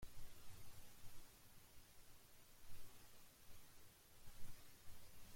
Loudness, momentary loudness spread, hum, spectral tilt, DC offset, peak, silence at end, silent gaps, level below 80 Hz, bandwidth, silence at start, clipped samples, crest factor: -65 LUFS; 4 LU; none; -3 dB/octave; under 0.1%; -38 dBFS; 0 s; none; -66 dBFS; 16.5 kHz; 0 s; under 0.1%; 16 dB